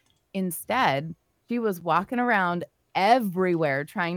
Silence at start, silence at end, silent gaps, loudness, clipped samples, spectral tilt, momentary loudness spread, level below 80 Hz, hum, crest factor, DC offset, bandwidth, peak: 0.35 s; 0 s; none; -25 LUFS; under 0.1%; -5.5 dB/octave; 11 LU; -70 dBFS; none; 20 dB; under 0.1%; 19 kHz; -6 dBFS